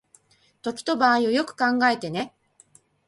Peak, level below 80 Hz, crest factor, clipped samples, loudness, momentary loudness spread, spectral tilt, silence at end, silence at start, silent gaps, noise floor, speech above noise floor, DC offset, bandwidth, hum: -6 dBFS; -68 dBFS; 18 dB; under 0.1%; -23 LUFS; 13 LU; -4.5 dB/octave; 0.8 s; 0.65 s; none; -59 dBFS; 37 dB; under 0.1%; 11.5 kHz; none